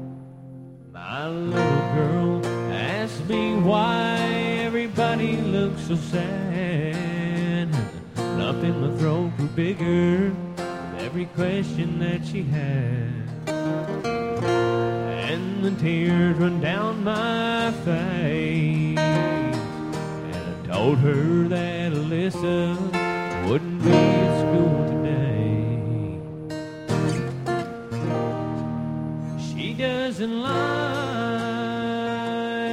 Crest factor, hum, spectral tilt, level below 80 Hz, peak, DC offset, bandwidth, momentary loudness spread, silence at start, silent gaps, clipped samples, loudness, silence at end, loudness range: 20 dB; none; -7 dB/octave; -50 dBFS; -4 dBFS; under 0.1%; 11.5 kHz; 10 LU; 0 s; none; under 0.1%; -24 LUFS; 0 s; 5 LU